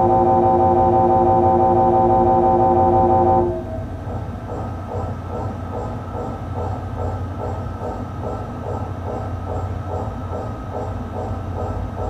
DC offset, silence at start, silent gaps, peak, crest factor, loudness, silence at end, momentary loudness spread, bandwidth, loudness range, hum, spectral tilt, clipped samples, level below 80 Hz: 0.1%; 0 s; none; -4 dBFS; 16 dB; -20 LUFS; 0 s; 13 LU; 8.2 kHz; 12 LU; none; -9.5 dB/octave; under 0.1%; -34 dBFS